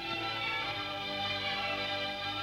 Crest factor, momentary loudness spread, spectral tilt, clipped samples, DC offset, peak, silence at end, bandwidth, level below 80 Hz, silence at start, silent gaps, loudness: 12 dB; 2 LU; -3.5 dB/octave; under 0.1%; under 0.1%; -22 dBFS; 0 s; 16 kHz; -62 dBFS; 0 s; none; -33 LUFS